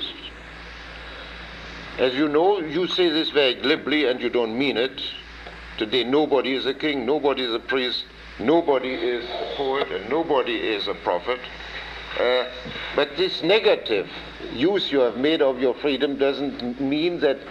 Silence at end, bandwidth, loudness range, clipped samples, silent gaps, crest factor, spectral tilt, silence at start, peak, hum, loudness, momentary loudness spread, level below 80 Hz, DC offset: 0 s; 8.6 kHz; 3 LU; under 0.1%; none; 18 dB; -5.5 dB/octave; 0 s; -6 dBFS; none; -23 LUFS; 16 LU; -50 dBFS; under 0.1%